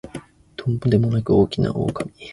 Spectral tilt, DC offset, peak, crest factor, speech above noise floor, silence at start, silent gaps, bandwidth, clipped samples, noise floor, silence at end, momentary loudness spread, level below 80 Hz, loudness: -8.5 dB/octave; under 0.1%; -4 dBFS; 18 dB; 20 dB; 0.05 s; none; 11.5 kHz; under 0.1%; -39 dBFS; 0 s; 20 LU; -44 dBFS; -21 LUFS